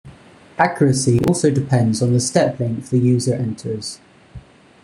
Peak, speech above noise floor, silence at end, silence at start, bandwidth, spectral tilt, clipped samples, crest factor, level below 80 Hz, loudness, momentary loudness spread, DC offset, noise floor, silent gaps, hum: -2 dBFS; 26 dB; 0.45 s; 0.05 s; 12.5 kHz; -6 dB/octave; under 0.1%; 16 dB; -48 dBFS; -18 LUFS; 11 LU; under 0.1%; -44 dBFS; none; none